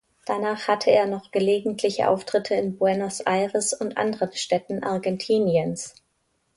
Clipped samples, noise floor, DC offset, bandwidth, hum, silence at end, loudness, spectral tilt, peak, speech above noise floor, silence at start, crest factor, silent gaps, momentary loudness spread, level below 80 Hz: under 0.1%; -71 dBFS; under 0.1%; 11.5 kHz; none; 0.65 s; -24 LUFS; -4.5 dB/octave; -6 dBFS; 48 dB; 0.25 s; 18 dB; none; 6 LU; -66 dBFS